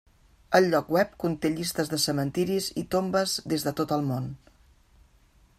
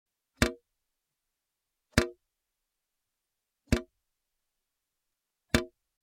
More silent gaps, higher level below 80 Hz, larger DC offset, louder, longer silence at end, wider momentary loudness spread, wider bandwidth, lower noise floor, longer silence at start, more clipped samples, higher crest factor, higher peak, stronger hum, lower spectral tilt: neither; second, -58 dBFS vs -46 dBFS; neither; first, -27 LUFS vs -31 LUFS; first, 1.2 s vs 0.35 s; about the same, 6 LU vs 4 LU; about the same, 16 kHz vs 16.5 kHz; second, -60 dBFS vs -86 dBFS; about the same, 0.5 s vs 0.4 s; neither; second, 22 dB vs 32 dB; about the same, -6 dBFS vs -4 dBFS; neither; about the same, -4.5 dB/octave vs -4.5 dB/octave